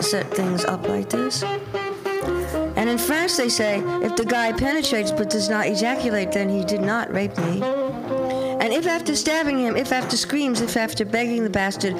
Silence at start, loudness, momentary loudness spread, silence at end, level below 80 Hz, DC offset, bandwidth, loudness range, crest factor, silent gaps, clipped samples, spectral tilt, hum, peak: 0 s; -22 LUFS; 4 LU; 0 s; -46 dBFS; under 0.1%; 16.5 kHz; 2 LU; 18 dB; none; under 0.1%; -4 dB/octave; none; -4 dBFS